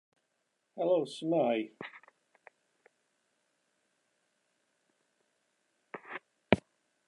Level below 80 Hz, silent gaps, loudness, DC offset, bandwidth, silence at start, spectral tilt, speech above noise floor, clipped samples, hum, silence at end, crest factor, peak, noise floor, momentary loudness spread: -66 dBFS; none; -32 LUFS; under 0.1%; 11 kHz; 0.75 s; -6.5 dB/octave; 49 dB; under 0.1%; none; 0.5 s; 32 dB; -6 dBFS; -81 dBFS; 19 LU